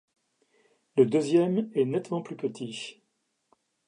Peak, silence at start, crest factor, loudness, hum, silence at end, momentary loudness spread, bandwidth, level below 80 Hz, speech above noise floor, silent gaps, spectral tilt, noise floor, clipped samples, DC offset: -8 dBFS; 0.95 s; 20 dB; -27 LUFS; none; 0.95 s; 13 LU; 10.5 kHz; -80 dBFS; 50 dB; none; -6.5 dB/octave; -77 dBFS; under 0.1%; under 0.1%